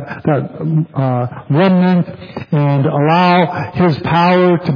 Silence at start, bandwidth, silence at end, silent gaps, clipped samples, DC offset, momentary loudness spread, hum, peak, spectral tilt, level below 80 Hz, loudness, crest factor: 0 s; 5.2 kHz; 0 s; none; under 0.1%; under 0.1%; 7 LU; none; 0 dBFS; -9.5 dB/octave; -50 dBFS; -14 LUFS; 14 dB